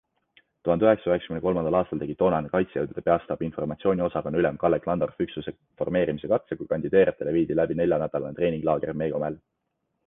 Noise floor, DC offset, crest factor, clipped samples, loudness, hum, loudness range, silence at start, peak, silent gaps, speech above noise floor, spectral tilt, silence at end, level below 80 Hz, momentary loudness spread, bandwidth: -78 dBFS; under 0.1%; 20 dB; under 0.1%; -26 LUFS; none; 2 LU; 0.65 s; -6 dBFS; none; 53 dB; -10.5 dB/octave; 0.7 s; -52 dBFS; 9 LU; 3.9 kHz